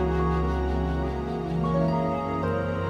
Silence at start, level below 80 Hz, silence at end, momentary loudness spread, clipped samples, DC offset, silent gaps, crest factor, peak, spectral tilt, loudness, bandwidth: 0 s; -34 dBFS; 0 s; 4 LU; under 0.1%; under 0.1%; none; 14 dB; -12 dBFS; -9 dB/octave; -27 LUFS; 6.8 kHz